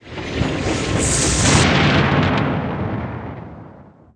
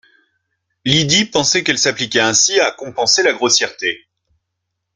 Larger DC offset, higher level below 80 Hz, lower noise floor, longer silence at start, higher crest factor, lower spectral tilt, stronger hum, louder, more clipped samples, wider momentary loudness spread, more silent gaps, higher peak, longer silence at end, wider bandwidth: neither; first, -32 dBFS vs -54 dBFS; second, -43 dBFS vs -76 dBFS; second, 0.05 s vs 0.85 s; about the same, 18 dB vs 16 dB; first, -4 dB/octave vs -2 dB/octave; neither; second, -17 LUFS vs -14 LUFS; neither; first, 16 LU vs 9 LU; neither; about the same, 0 dBFS vs 0 dBFS; second, 0.3 s vs 1 s; about the same, 10.5 kHz vs 11 kHz